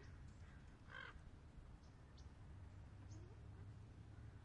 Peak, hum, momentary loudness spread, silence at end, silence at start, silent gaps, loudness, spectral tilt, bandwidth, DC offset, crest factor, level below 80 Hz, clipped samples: -44 dBFS; none; 6 LU; 0 s; 0 s; none; -60 LUFS; -6 dB/octave; 10 kHz; under 0.1%; 16 dB; -64 dBFS; under 0.1%